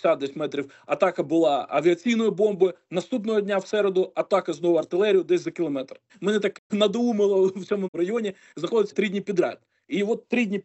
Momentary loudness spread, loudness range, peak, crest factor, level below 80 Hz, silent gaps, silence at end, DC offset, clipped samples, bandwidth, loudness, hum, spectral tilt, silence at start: 8 LU; 2 LU; -6 dBFS; 18 dB; -76 dBFS; 6.59-6.70 s, 7.88-7.93 s; 0.05 s; under 0.1%; under 0.1%; 8.2 kHz; -24 LUFS; none; -6 dB/octave; 0.05 s